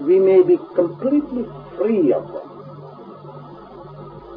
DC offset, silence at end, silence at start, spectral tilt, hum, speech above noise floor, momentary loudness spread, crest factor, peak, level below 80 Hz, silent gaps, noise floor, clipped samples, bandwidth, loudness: under 0.1%; 0 s; 0 s; -11.5 dB/octave; none; 21 dB; 25 LU; 16 dB; -4 dBFS; -56 dBFS; none; -38 dBFS; under 0.1%; 4.7 kHz; -18 LUFS